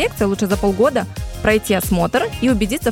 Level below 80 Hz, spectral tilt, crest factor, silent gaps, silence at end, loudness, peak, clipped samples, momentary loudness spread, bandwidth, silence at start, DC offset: -32 dBFS; -5 dB/octave; 14 dB; none; 0 s; -18 LUFS; -2 dBFS; under 0.1%; 4 LU; 17.5 kHz; 0 s; under 0.1%